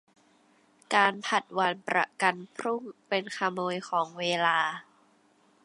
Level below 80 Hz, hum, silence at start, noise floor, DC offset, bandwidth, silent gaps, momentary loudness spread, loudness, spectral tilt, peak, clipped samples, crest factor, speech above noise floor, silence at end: -84 dBFS; none; 0.9 s; -65 dBFS; under 0.1%; 11.5 kHz; none; 9 LU; -28 LUFS; -3.5 dB/octave; -8 dBFS; under 0.1%; 22 dB; 36 dB; 0.85 s